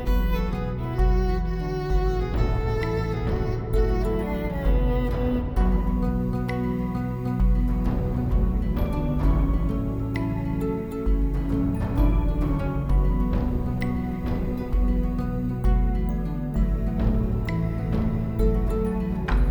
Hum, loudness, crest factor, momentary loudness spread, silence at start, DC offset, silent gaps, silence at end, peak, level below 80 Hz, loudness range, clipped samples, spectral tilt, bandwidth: none; -26 LUFS; 14 dB; 4 LU; 0 s; under 0.1%; none; 0 s; -10 dBFS; -26 dBFS; 1 LU; under 0.1%; -9 dB/octave; 19 kHz